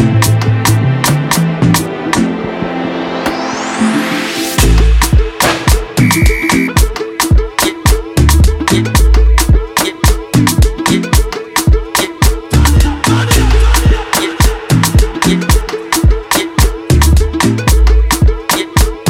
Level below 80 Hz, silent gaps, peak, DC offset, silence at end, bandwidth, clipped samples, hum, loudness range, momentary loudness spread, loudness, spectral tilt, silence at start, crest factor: -14 dBFS; none; 0 dBFS; under 0.1%; 0 s; 17 kHz; under 0.1%; none; 2 LU; 5 LU; -11 LUFS; -4.5 dB/octave; 0 s; 10 dB